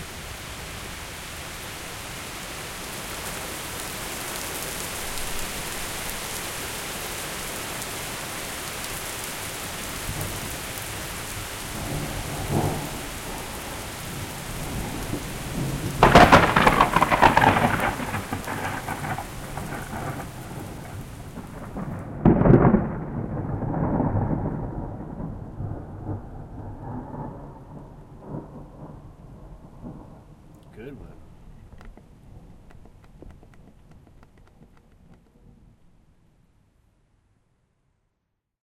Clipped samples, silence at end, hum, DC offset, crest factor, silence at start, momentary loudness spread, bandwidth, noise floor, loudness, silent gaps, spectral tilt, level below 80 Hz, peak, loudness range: under 0.1%; 3.15 s; none; under 0.1%; 24 dB; 0 s; 21 LU; 17 kHz; -78 dBFS; -25 LUFS; none; -4.5 dB/octave; -40 dBFS; -2 dBFS; 22 LU